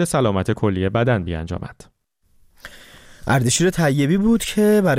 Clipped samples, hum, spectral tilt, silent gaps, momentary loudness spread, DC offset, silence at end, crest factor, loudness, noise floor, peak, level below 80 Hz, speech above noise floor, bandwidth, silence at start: under 0.1%; none; -5.5 dB/octave; none; 14 LU; under 0.1%; 0 s; 12 dB; -19 LUFS; -59 dBFS; -8 dBFS; -42 dBFS; 41 dB; 16 kHz; 0 s